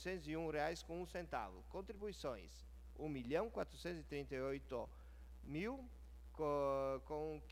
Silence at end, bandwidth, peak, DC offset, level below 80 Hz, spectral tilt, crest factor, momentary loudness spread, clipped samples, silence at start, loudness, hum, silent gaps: 0 s; 16 kHz; -26 dBFS; under 0.1%; -58 dBFS; -6 dB/octave; 18 dB; 17 LU; under 0.1%; 0 s; -46 LUFS; none; none